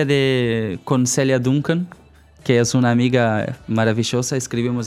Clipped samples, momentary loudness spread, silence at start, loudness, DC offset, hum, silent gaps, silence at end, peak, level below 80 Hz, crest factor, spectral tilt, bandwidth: under 0.1%; 7 LU; 0 s; -19 LUFS; under 0.1%; none; none; 0 s; -2 dBFS; -52 dBFS; 16 dB; -5.5 dB/octave; 14.5 kHz